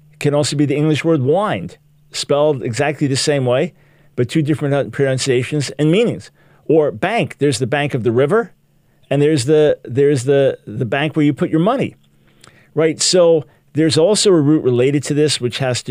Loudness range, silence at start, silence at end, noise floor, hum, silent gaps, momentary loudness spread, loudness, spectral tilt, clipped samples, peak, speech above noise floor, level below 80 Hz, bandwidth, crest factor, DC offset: 3 LU; 0.2 s; 0 s; -54 dBFS; none; none; 8 LU; -16 LUFS; -5 dB/octave; under 0.1%; 0 dBFS; 39 dB; -58 dBFS; 15.5 kHz; 16 dB; under 0.1%